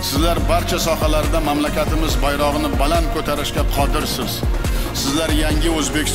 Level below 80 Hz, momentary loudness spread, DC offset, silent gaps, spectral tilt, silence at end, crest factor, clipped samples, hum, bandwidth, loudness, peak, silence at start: -22 dBFS; 3 LU; 1%; none; -4.5 dB/octave; 0 s; 14 dB; under 0.1%; none; 16.5 kHz; -19 LUFS; -4 dBFS; 0 s